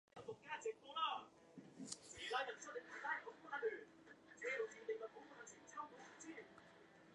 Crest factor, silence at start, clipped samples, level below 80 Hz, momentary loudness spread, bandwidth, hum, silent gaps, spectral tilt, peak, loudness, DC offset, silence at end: 24 dB; 0.15 s; under 0.1%; -86 dBFS; 18 LU; 11 kHz; none; none; -2 dB/octave; -26 dBFS; -49 LUFS; under 0.1%; 0 s